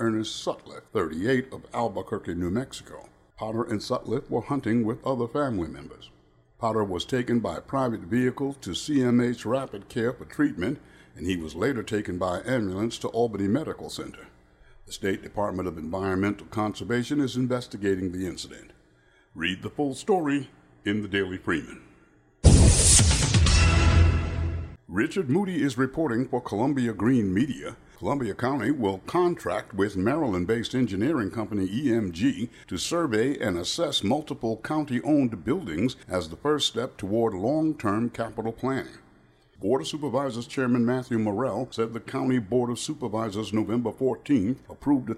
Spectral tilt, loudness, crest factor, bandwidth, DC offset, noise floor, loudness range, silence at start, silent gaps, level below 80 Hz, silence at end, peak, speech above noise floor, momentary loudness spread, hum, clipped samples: -5 dB/octave; -26 LUFS; 22 dB; 14.5 kHz; under 0.1%; -60 dBFS; 8 LU; 0 s; none; -36 dBFS; 0 s; -4 dBFS; 33 dB; 9 LU; none; under 0.1%